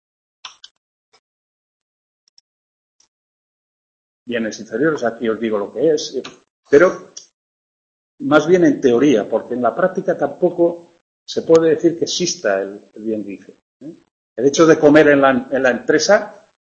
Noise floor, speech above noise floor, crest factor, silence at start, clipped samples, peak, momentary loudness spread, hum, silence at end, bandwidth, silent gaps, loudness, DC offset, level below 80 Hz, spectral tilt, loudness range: under -90 dBFS; over 74 dB; 18 dB; 0.45 s; under 0.1%; 0 dBFS; 17 LU; none; 0.45 s; 8 kHz; 0.71-1.12 s, 1.19-2.99 s, 3.08-4.26 s, 6.50-6.63 s, 7.34-8.18 s, 11.01-11.26 s, 13.62-13.80 s, 14.11-14.36 s; -16 LUFS; under 0.1%; -58 dBFS; -4.5 dB/octave; 9 LU